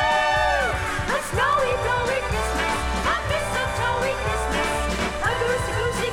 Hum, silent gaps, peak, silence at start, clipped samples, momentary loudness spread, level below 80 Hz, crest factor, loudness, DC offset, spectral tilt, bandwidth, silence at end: none; none; -10 dBFS; 0 s; under 0.1%; 4 LU; -34 dBFS; 14 dB; -23 LUFS; under 0.1%; -4 dB/octave; 18.5 kHz; 0 s